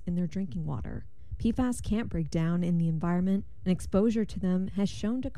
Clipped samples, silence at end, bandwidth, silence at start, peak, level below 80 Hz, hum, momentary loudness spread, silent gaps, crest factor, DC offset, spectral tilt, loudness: under 0.1%; 0.05 s; 12 kHz; 0.05 s; -14 dBFS; -44 dBFS; none; 8 LU; none; 16 dB; 1%; -7.5 dB/octave; -30 LUFS